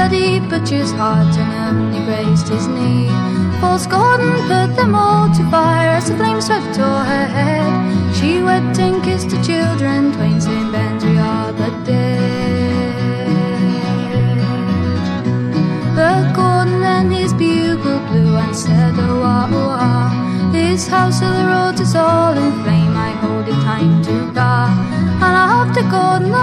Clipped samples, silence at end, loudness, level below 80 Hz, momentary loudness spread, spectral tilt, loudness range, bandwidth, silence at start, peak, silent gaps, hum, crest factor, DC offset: under 0.1%; 0 s; -15 LUFS; -42 dBFS; 5 LU; -6.5 dB/octave; 3 LU; 12.5 kHz; 0 s; -2 dBFS; none; none; 12 dB; 0.1%